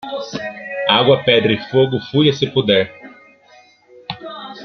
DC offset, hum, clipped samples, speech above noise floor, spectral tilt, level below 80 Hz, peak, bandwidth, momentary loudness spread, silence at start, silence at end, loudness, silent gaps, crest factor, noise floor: under 0.1%; none; under 0.1%; 33 dB; -6 dB/octave; -56 dBFS; 0 dBFS; 6.4 kHz; 18 LU; 0.05 s; 0 s; -16 LUFS; none; 18 dB; -49 dBFS